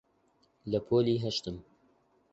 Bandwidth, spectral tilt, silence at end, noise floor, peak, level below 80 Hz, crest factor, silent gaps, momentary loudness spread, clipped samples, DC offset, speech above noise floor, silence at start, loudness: 8 kHz; -6.5 dB/octave; 0.7 s; -70 dBFS; -16 dBFS; -60 dBFS; 18 dB; none; 18 LU; under 0.1%; under 0.1%; 40 dB; 0.65 s; -31 LUFS